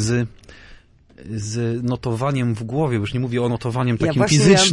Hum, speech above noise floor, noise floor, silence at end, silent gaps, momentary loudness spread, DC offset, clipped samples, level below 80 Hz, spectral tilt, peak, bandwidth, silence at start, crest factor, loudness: none; 28 dB; -47 dBFS; 0 s; none; 11 LU; under 0.1%; under 0.1%; -44 dBFS; -5 dB/octave; -2 dBFS; 11.5 kHz; 0 s; 16 dB; -20 LUFS